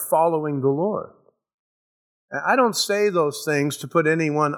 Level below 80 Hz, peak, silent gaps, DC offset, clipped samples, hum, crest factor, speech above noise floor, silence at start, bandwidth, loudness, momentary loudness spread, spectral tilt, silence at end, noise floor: -76 dBFS; -6 dBFS; 1.54-2.28 s; under 0.1%; under 0.1%; none; 18 dB; over 69 dB; 0 s; over 20 kHz; -21 LUFS; 8 LU; -4.5 dB/octave; 0 s; under -90 dBFS